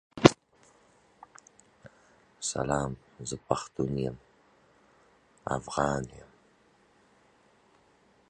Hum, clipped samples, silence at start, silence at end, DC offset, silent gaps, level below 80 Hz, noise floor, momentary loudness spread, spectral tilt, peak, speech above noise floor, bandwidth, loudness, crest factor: none; under 0.1%; 0.15 s; 2.1 s; under 0.1%; none; -56 dBFS; -64 dBFS; 28 LU; -5 dB/octave; 0 dBFS; 32 dB; 10.5 kHz; -30 LUFS; 34 dB